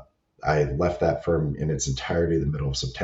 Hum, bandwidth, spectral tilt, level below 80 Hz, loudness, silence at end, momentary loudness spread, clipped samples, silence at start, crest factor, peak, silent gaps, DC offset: none; 8 kHz; -5.5 dB/octave; -38 dBFS; -25 LUFS; 0 s; 4 LU; under 0.1%; 0 s; 16 dB; -10 dBFS; none; under 0.1%